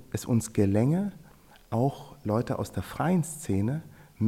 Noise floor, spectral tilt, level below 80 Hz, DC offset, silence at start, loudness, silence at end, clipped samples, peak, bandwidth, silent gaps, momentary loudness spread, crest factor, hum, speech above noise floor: -55 dBFS; -7 dB/octave; -58 dBFS; under 0.1%; 0 s; -29 LUFS; 0 s; under 0.1%; -12 dBFS; 16.5 kHz; none; 9 LU; 16 dB; none; 27 dB